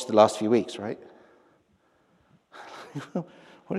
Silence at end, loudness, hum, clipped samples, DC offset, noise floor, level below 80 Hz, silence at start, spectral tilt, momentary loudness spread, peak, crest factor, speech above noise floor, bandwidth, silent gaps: 0 s; -26 LUFS; none; under 0.1%; under 0.1%; -66 dBFS; -76 dBFS; 0 s; -5.5 dB/octave; 24 LU; -4 dBFS; 24 dB; 41 dB; 13 kHz; none